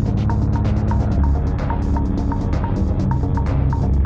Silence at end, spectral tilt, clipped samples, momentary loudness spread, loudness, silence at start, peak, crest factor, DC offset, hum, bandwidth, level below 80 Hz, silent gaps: 0 s; -9.5 dB/octave; under 0.1%; 3 LU; -20 LUFS; 0 s; -6 dBFS; 10 dB; under 0.1%; none; 7 kHz; -22 dBFS; none